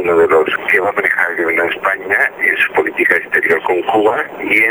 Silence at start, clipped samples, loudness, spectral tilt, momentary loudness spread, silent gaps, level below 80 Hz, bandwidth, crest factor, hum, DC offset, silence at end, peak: 0 s; under 0.1%; -13 LUFS; -4.5 dB/octave; 3 LU; none; -56 dBFS; over 20 kHz; 14 dB; none; under 0.1%; 0 s; 0 dBFS